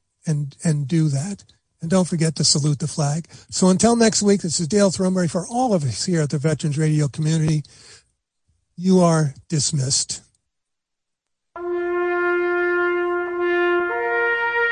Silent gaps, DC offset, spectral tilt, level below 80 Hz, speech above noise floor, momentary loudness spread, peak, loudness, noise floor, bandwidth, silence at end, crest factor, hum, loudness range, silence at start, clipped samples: none; under 0.1%; -5 dB/octave; -56 dBFS; 60 dB; 9 LU; -2 dBFS; -20 LUFS; -79 dBFS; 10.5 kHz; 0 s; 18 dB; none; 5 LU; 0.25 s; under 0.1%